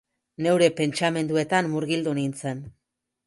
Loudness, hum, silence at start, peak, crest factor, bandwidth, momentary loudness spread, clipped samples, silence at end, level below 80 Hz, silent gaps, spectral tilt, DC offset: -24 LUFS; none; 0.4 s; -4 dBFS; 20 dB; 11.5 kHz; 11 LU; under 0.1%; 0.55 s; -66 dBFS; none; -5.5 dB/octave; under 0.1%